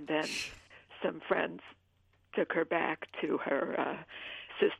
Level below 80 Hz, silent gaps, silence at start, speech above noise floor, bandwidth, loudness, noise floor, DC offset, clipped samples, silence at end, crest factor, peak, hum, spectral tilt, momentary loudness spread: -72 dBFS; none; 0 s; 36 dB; 14 kHz; -35 LUFS; -70 dBFS; under 0.1%; under 0.1%; 0.05 s; 22 dB; -14 dBFS; none; -4 dB/octave; 11 LU